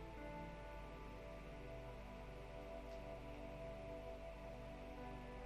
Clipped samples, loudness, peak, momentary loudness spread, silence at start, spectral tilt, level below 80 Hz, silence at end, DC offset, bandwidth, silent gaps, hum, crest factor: under 0.1%; -54 LUFS; -40 dBFS; 2 LU; 0 s; -6.5 dB/octave; -58 dBFS; 0 s; under 0.1%; 15 kHz; none; none; 12 dB